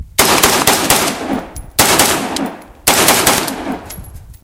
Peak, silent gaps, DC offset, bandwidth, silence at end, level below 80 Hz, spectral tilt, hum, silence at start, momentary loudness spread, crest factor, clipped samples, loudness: 0 dBFS; none; under 0.1%; over 20 kHz; 0.1 s; -36 dBFS; -1.5 dB/octave; none; 0 s; 15 LU; 14 dB; 0.1%; -12 LUFS